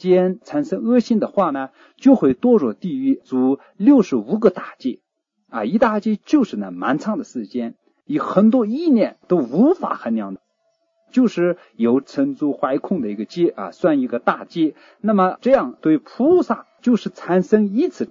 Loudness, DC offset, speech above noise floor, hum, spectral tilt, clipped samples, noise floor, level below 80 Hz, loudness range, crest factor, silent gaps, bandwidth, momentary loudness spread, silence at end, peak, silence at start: -19 LUFS; under 0.1%; 50 dB; none; -8 dB/octave; under 0.1%; -68 dBFS; -62 dBFS; 4 LU; 18 dB; none; 7.4 kHz; 11 LU; 0.05 s; 0 dBFS; 0 s